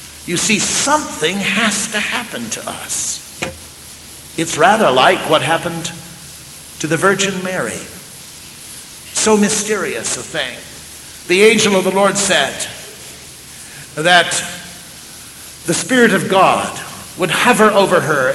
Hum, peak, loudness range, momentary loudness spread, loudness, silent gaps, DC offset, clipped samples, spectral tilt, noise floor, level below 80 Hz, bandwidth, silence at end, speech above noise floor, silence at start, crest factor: none; 0 dBFS; 4 LU; 22 LU; -14 LUFS; none; under 0.1%; under 0.1%; -3 dB/octave; -36 dBFS; -50 dBFS; 16.5 kHz; 0 s; 21 dB; 0 s; 16 dB